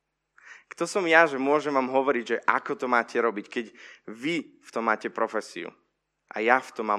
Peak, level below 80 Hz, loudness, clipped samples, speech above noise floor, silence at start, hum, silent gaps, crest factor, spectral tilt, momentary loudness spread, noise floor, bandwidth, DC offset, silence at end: -2 dBFS; -84 dBFS; -26 LUFS; under 0.1%; 31 dB; 0.45 s; 50 Hz at -70 dBFS; none; 24 dB; -4 dB/octave; 18 LU; -57 dBFS; 12.5 kHz; under 0.1%; 0 s